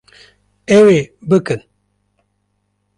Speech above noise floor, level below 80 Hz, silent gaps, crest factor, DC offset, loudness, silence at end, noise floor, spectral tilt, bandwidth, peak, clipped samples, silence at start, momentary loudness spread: 55 dB; -54 dBFS; none; 14 dB; under 0.1%; -13 LUFS; 1.4 s; -67 dBFS; -6.5 dB/octave; 11 kHz; -2 dBFS; under 0.1%; 0.7 s; 15 LU